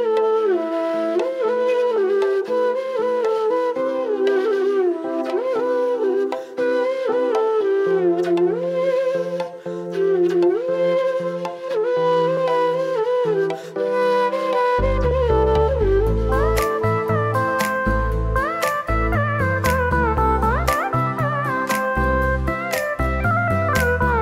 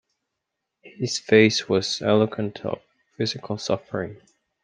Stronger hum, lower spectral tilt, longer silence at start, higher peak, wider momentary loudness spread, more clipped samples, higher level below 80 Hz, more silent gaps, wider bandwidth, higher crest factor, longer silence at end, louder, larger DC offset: neither; first, -6.5 dB/octave vs -4.5 dB/octave; second, 0 s vs 0.85 s; about the same, -2 dBFS vs -2 dBFS; second, 4 LU vs 15 LU; neither; first, -30 dBFS vs -66 dBFS; neither; first, 16 kHz vs 9.8 kHz; second, 16 dB vs 22 dB; second, 0 s vs 0.5 s; first, -20 LUFS vs -23 LUFS; neither